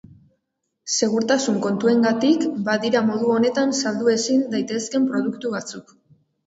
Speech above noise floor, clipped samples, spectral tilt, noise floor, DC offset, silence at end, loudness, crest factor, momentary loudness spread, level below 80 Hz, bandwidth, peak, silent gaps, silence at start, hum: 56 dB; under 0.1%; -4 dB/octave; -77 dBFS; under 0.1%; 0.65 s; -21 LUFS; 16 dB; 9 LU; -66 dBFS; 8 kHz; -6 dBFS; none; 0.85 s; none